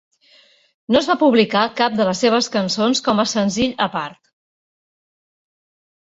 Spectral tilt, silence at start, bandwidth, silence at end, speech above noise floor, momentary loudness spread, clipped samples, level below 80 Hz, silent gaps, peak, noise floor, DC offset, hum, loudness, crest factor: -4 dB/octave; 0.9 s; 8 kHz; 2 s; 36 dB; 6 LU; under 0.1%; -54 dBFS; none; -2 dBFS; -53 dBFS; under 0.1%; none; -17 LUFS; 18 dB